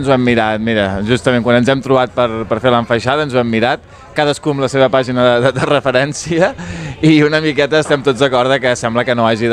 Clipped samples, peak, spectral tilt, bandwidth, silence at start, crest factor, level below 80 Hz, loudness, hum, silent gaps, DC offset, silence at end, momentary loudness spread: under 0.1%; 0 dBFS; -5.5 dB/octave; 11 kHz; 0 s; 14 dB; -44 dBFS; -13 LUFS; none; none; under 0.1%; 0 s; 5 LU